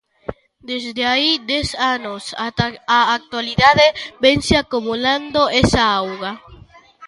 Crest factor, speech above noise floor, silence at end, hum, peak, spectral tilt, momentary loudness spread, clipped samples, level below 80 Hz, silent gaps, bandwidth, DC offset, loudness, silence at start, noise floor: 18 dB; 27 dB; 0 s; none; 0 dBFS; -4 dB/octave; 14 LU; under 0.1%; -38 dBFS; none; 11.5 kHz; under 0.1%; -17 LUFS; 0.3 s; -44 dBFS